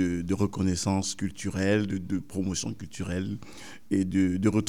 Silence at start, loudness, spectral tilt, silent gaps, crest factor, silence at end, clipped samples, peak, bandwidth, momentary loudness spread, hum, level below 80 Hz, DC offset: 0 s; -29 LUFS; -5.5 dB/octave; none; 16 dB; 0 s; under 0.1%; -12 dBFS; 15 kHz; 11 LU; none; -58 dBFS; 0.5%